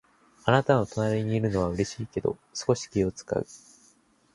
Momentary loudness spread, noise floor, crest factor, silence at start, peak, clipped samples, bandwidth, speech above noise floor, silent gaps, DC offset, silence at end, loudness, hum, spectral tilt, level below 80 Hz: 8 LU; -62 dBFS; 22 dB; 0.45 s; -6 dBFS; under 0.1%; 11.5 kHz; 36 dB; none; under 0.1%; 0.75 s; -27 LUFS; none; -6 dB/octave; -50 dBFS